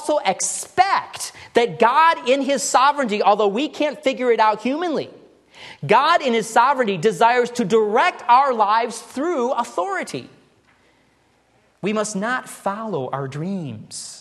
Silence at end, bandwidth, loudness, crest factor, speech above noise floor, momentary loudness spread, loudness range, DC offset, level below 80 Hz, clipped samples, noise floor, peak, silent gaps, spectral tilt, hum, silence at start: 0 s; 12.5 kHz; -19 LUFS; 18 dB; 41 dB; 12 LU; 10 LU; under 0.1%; -68 dBFS; under 0.1%; -60 dBFS; -2 dBFS; none; -3.5 dB/octave; none; 0 s